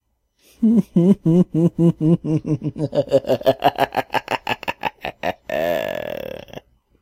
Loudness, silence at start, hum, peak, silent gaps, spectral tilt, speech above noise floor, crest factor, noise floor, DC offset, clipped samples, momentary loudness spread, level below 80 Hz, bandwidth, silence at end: -20 LUFS; 0.6 s; none; 0 dBFS; none; -7.5 dB/octave; 43 dB; 20 dB; -60 dBFS; under 0.1%; under 0.1%; 11 LU; -52 dBFS; 16 kHz; 0.45 s